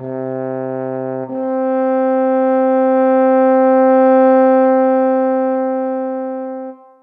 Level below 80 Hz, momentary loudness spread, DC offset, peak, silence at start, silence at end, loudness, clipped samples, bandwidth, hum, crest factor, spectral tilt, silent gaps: -78 dBFS; 12 LU; under 0.1%; -2 dBFS; 0 s; 0.3 s; -14 LUFS; under 0.1%; 3.6 kHz; none; 12 dB; -10 dB/octave; none